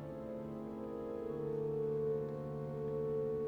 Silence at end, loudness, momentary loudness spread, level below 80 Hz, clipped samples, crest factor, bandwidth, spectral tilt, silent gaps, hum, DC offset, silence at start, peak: 0 s; -40 LUFS; 7 LU; -64 dBFS; under 0.1%; 10 dB; 5.2 kHz; -10 dB/octave; none; none; under 0.1%; 0 s; -28 dBFS